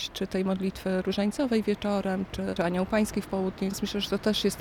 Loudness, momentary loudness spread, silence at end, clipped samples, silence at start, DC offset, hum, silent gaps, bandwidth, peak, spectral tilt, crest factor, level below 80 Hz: -29 LUFS; 5 LU; 0 s; under 0.1%; 0 s; under 0.1%; none; none; 17.5 kHz; -12 dBFS; -5.5 dB/octave; 16 dB; -50 dBFS